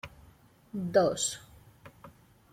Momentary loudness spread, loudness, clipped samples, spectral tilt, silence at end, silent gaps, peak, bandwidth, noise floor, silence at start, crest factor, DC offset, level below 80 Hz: 26 LU; -29 LUFS; under 0.1%; -3.5 dB/octave; 0.45 s; none; -12 dBFS; 16 kHz; -59 dBFS; 0.05 s; 22 dB; under 0.1%; -62 dBFS